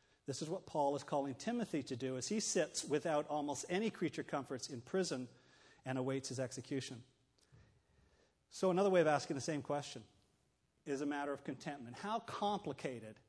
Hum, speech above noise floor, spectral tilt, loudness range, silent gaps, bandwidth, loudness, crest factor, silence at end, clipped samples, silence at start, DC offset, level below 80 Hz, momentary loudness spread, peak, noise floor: none; 39 dB; -4.5 dB/octave; 5 LU; none; 11 kHz; -40 LUFS; 20 dB; 0.15 s; under 0.1%; 0.3 s; under 0.1%; -80 dBFS; 11 LU; -20 dBFS; -79 dBFS